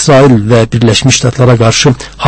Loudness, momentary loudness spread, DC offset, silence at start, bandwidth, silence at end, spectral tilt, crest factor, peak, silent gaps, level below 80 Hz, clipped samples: -7 LUFS; 3 LU; under 0.1%; 0 s; 11 kHz; 0 s; -5 dB/octave; 6 dB; 0 dBFS; none; -32 dBFS; 3%